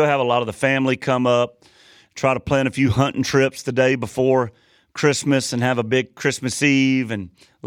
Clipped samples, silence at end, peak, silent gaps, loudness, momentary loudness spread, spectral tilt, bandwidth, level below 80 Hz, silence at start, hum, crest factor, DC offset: under 0.1%; 0 s; -4 dBFS; none; -20 LUFS; 6 LU; -5 dB/octave; 15 kHz; -52 dBFS; 0 s; none; 16 dB; under 0.1%